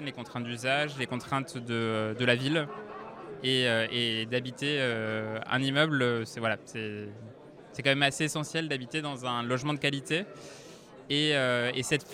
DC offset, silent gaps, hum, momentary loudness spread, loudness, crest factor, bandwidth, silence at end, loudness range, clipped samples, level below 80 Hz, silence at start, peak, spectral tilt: under 0.1%; none; none; 17 LU; -29 LUFS; 22 dB; 16 kHz; 0 s; 2 LU; under 0.1%; -70 dBFS; 0 s; -8 dBFS; -4.5 dB/octave